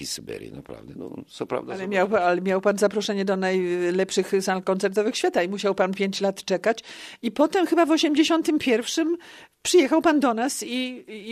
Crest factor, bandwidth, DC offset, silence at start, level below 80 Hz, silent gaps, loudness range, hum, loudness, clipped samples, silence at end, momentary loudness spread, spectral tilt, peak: 18 dB; 14 kHz; under 0.1%; 0 s; -64 dBFS; none; 3 LU; none; -23 LUFS; under 0.1%; 0 s; 16 LU; -4 dB/octave; -6 dBFS